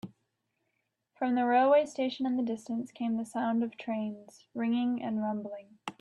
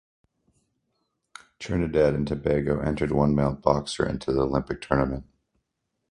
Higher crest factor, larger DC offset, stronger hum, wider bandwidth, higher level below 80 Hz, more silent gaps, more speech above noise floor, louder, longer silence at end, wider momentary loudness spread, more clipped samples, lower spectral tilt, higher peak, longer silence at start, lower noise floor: second, 16 dB vs 22 dB; neither; neither; about the same, 11.5 kHz vs 11 kHz; second, -80 dBFS vs -42 dBFS; neither; second, 51 dB vs 55 dB; second, -31 LUFS vs -25 LUFS; second, 0.1 s vs 0.9 s; first, 17 LU vs 6 LU; neither; about the same, -6 dB/octave vs -7 dB/octave; second, -14 dBFS vs -4 dBFS; second, 0.05 s vs 1.6 s; about the same, -81 dBFS vs -79 dBFS